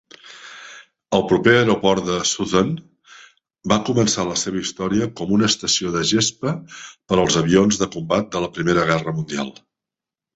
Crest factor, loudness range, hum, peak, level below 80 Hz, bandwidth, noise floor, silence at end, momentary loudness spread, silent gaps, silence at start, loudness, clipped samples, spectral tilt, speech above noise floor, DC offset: 20 dB; 2 LU; none; -2 dBFS; -50 dBFS; 8.4 kHz; -88 dBFS; 0.85 s; 17 LU; none; 0.25 s; -19 LUFS; under 0.1%; -4 dB/octave; 69 dB; under 0.1%